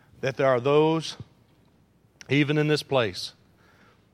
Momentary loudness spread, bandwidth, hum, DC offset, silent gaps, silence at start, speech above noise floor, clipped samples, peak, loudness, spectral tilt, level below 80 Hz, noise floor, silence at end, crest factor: 15 LU; 13.5 kHz; none; under 0.1%; none; 0.25 s; 38 dB; under 0.1%; -8 dBFS; -24 LUFS; -6 dB/octave; -66 dBFS; -61 dBFS; 0.85 s; 18 dB